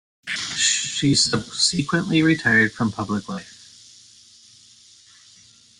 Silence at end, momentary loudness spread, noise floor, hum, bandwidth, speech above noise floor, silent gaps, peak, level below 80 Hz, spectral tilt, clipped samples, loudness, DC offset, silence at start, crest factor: 2.25 s; 11 LU; -52 dBFS; none; 11.5 kHz; 31 dB; none; -4 dBFS; -56 dBFS; -3 dB/octave; under 0.1%; -20 LUFS; under 0.1%; 0.25 s; 18 dB